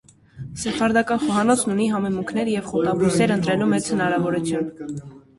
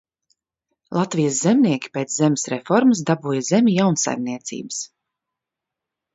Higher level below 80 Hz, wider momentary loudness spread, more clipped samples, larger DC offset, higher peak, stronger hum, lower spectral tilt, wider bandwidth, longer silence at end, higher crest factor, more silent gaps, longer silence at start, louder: first, -54 dBFS vs -66 dBFS; about the same, 11 LU vs 12 LU; neither; neither; about the same, -4 dBFS vs -4 dBFS; neither; about the same, -5 dB/octave vs -5 dB/octave; first, 11.5 kHz vs 8 kHz; second, 0.2 s vs 1.3 s; about the same, 16 dB vs 18 dB; neither; second, 0.35 s vs 0.9 s; about the same, -21 LUFS vs -20 LUFS